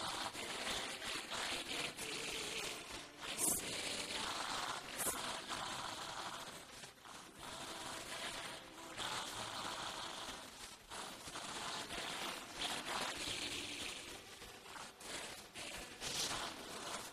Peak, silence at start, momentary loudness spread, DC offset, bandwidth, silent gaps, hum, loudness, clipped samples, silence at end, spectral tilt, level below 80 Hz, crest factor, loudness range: -22 dBFS; 0 s; 11 LU; under 0.1%; 14.5 kHz; none; none; -43 LUFS; under 0.1%; 0 s; -1 dB/octave; -68 dBFS; 22 dB; 6 LU